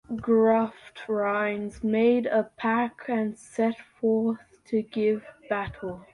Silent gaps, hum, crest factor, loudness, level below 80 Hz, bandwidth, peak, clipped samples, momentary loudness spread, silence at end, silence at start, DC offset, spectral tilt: none; none; 16 dB; -26 LUFS; -58 dBFS; 11 kHz; -10 dBFS; under 0.1%; 10 LU; 0.1 s; 0.1 s; under 0.1%; -7 dB/octave